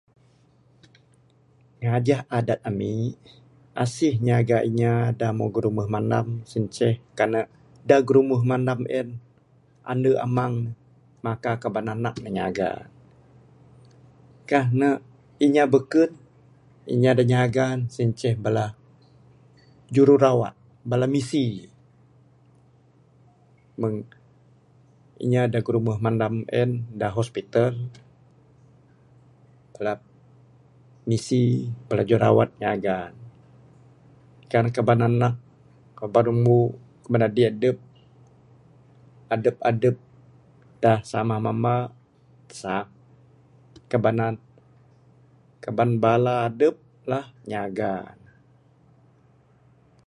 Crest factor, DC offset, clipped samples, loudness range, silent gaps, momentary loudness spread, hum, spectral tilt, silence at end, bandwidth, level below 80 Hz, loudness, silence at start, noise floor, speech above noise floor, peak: 20 dB; under 0.1%; under 0.1%; 7 LU; none; 14 LU; none; -7.5 dB/octave; 2 s; 11 kHz; -58 dBFS; -23 LUFS; 1.8 s; -59 dBFS; 37 dB; -4 dBFS